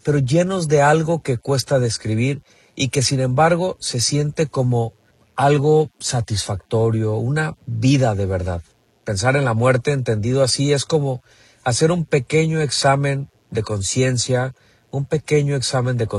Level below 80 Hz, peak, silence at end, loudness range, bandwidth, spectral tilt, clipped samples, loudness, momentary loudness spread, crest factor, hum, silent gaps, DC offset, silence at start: -48 dBFS; -2 dBFS; 0 s; 2 LU; 12.5 kHz; -5 dB/octave; under 0.1%; -19 LUFS; 10 LU; 16 dB; none; none; under 0.1%; 0.05 s